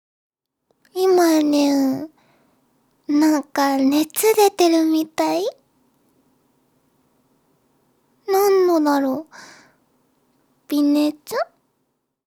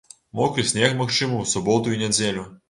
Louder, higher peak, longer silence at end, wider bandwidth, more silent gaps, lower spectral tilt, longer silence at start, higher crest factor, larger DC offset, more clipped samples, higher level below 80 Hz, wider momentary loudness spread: first, -18 LUFS vs -21 LUFS; about the same, -4 dBFS vs -4 dBFS; first, 0.85 s vs 0.15 s; first, over 20 kHz vs 11.5 kHz; neither; about the same, -3 dB/octave vs -3.5 dB/octave; first, 0.95 s vs 0.35 s; about the same, 18 dB vs 20 dB; neither; neither; second, -76 dBFS vs -54 dBFS; first, 14 LU vs 5 LU